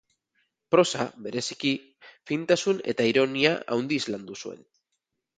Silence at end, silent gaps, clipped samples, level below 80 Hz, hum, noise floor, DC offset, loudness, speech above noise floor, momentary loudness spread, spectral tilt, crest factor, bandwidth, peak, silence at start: 0.85 s; none; under 0.1%; -70 dBFS; none; -81 dBFS; under 0.1%; -26 LUFS; 55 dB; 11 LU; -4 dB/octave; 22 dB; 9.4 kHz; -4 dBFS; 0.7 s